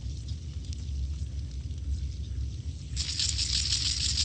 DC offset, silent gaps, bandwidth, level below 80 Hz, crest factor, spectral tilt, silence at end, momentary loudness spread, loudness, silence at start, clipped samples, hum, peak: under 0.1%; none; 9.4 kHz; -36 dBFS; 22 dB; -2 dB/octave; 0 s; 12 LU; -31 LUFS; 0 s; under 0.1%; none; -10 dBFS